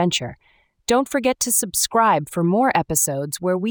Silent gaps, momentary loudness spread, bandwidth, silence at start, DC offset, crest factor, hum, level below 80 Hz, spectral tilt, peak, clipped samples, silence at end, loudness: none; 7 LU; over 20 kHz; 0 s; under 0.1%; 16 dB; none; -52 dBFS; -3.5 dB/octave; -4 dBFS; under 0.1%; 0 s; -19 LUFS